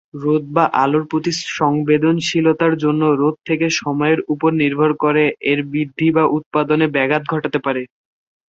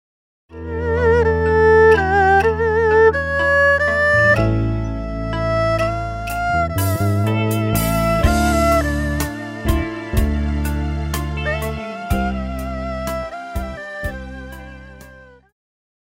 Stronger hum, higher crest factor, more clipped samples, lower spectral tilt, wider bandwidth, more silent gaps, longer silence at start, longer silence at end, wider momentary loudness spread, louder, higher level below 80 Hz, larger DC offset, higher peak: neither; about the same, 16 dB vs 16 dB; neither; about the same, -6 dB/octave vs -6 dB/octave; second, 7.8 kHz vs 16.5 kHz; first, 6.46-6.51 s vs none; second, 0.15 s vs 0.5 s; second, 0.65 s vs 0.8 s; second, 5 LU vs 14 LU; about the same, -17 LUFS vs -18 LUFS; second, -60 dBFS vs -28 dBFS; neither; about the same, -2 dBFS vs -2 dBFS